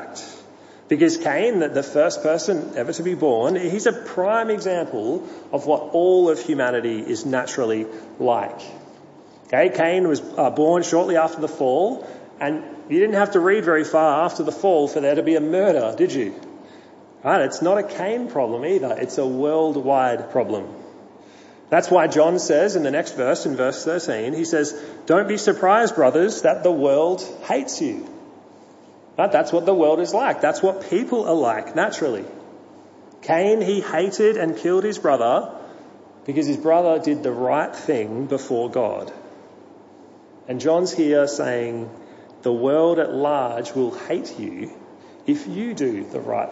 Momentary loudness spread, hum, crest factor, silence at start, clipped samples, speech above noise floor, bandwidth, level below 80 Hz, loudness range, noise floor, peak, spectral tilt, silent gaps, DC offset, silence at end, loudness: 11 LU; none; 18 dB; 0 s; under 0.1%; 27 dB; 8 kHz; -74 dBFS; 4 LU; -47 dBFS; -2 dBFS; -5 dB/octave; none; under 0.1%; 0 s; -20 LUFS